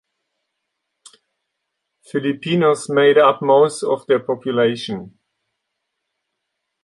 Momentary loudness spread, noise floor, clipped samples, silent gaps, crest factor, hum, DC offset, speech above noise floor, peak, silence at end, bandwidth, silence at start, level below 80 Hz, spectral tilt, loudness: 13 LU; -77 dBFS; under 0.1%; none; 18 dB; none; under 0.1%; 61 dB; -2 dBFS; 1.75 s; 11.5 kHz; 2.15 s; -66 dBFS; -5.5 dB/octave; -17 LUFS